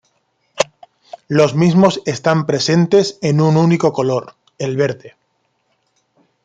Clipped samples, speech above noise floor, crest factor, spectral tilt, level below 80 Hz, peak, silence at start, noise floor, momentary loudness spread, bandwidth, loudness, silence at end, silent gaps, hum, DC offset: under 0.1%; 52 dB; 16 dB; -6 dB/octave; -56 dBFS; 0 dBFS; 0.55 s; -66 dBFS; 9 LU; 9 kHz; -15 LUFS; 1.35 s; none; none; under 0.1%